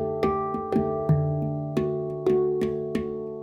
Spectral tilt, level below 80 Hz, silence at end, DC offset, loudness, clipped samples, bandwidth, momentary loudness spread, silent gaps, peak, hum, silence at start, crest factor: -9.5 dB/octave; -52 dBFS; 0 s; under 0.1%; -26 LUFS; under 0.1%; 7.8 kHz; 5 LU; none; -10 dBFS; none; 0 s; 16 dB